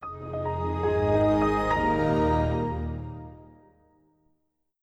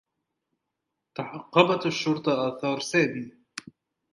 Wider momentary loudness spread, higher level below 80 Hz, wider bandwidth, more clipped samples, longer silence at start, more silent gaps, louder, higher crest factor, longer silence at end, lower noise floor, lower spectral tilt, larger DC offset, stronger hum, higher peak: second, 14 LU vs 19 LU; first, -40 dBFS vs -74 dBFS; second, 9.2 kHz vs 11.5 kHz; neither; second, 0 s vs 1.2 s; neither; about the same, -26 LUFS vs -25 LUFS; second, 16 dB vs 26 dB; first, 1.4 s vs 0.55 s; second, -74 dBFS vs -83 dBFS; first, -8 dB/octave vs -5 dB/octave; neither; neither; second, -12 dBFS vs -2 dBFS